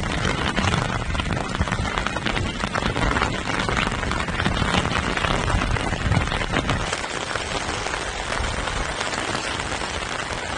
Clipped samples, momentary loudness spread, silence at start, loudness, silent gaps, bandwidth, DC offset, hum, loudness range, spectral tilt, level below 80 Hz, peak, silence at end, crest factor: under 0.1%; 4 LU; 0 s; -24 LUFS; none; 11 kHz; under 0.1%; none; 3 LU; -4 dB/octave; -32 dBFS; -2 dBFS; 0 s; 22 dB